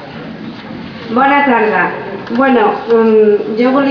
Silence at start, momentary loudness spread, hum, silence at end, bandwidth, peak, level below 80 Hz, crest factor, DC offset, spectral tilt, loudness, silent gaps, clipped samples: 0 s; 18 LU; none; 0 s; 5.4 kHz; 0 dBFS; -52 dBFS; 12 dB; under 0.1%; -7.5 dB/octave; -11 LUFS; none; under 0.1%